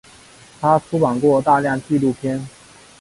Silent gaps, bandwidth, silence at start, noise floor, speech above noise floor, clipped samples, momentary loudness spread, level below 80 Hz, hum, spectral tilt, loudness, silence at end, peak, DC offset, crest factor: none; 11.5 kHz; 0.6 s; -45 dBFS; 28 dB; under 0.1%; 10 LU; -54 dBFS; none; -7.5 dB/octave; -18 LUFS; 0.5 s; -2 dBFS; under 0.1%; 18 dB